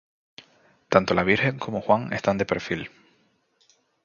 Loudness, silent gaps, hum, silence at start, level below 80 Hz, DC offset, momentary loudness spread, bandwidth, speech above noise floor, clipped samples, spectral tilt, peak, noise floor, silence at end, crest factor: -24 LUFS; none; none; 0.9 s; -54 dBFS; under 0.1%; 10 LU; 7.2 kHz; 42 dB; under 0.1%; -6 dB/octave; 0 dBFS; -66 dBFS; 1.15 s; 26 dB